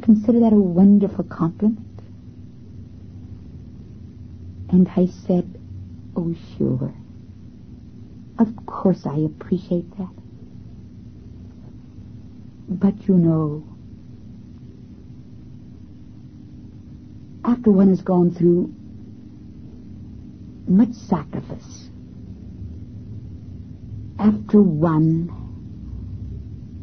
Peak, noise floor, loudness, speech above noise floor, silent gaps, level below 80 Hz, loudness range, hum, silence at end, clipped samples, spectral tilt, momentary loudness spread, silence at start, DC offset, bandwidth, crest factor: -4 dBFS; -41 dBFS; -19 LUFS; 23 dB; none; -44 dBFS; 10 LU; none; 0 s; under 0.1%; -10.5 dB/octave; 26 LU; 0 s; 0.3%; 6.4 kHz; 18 dB